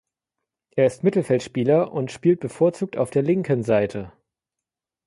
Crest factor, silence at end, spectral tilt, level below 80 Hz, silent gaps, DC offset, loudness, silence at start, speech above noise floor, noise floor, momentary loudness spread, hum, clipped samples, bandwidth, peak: 16 dB; 0.95 s; -7.5 dB/octave; -60 dBFS; none; under 0.1%; -22 LUFS; 0.75 s; 66 dB; -87 dBFS; 7 LU; none; under 0.1%; 11.5 kHz; -6 dBFS